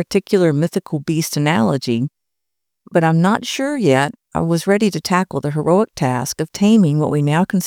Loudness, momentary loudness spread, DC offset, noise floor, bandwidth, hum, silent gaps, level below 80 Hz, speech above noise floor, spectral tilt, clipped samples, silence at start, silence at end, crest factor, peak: -17 LUFS; 7 LU; under 0.1%; -82 dBFS; 18 kHz; none; none; -54 dBFS; 65 dB; -6 dB/octave; under 0.1%; 0 s; 0 s; 16 dB; -2 dBFS